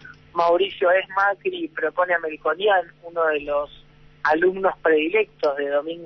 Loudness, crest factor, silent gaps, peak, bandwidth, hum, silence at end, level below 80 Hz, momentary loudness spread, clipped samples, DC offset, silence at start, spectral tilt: -22 LUFS; 16 dB; none; -6 dBFS; 6.2 kHz; none; 0 s; -58 dBFS; 7 LU; under 0.1%; under 0.1%; 0.05 s; -5.5 dB/octave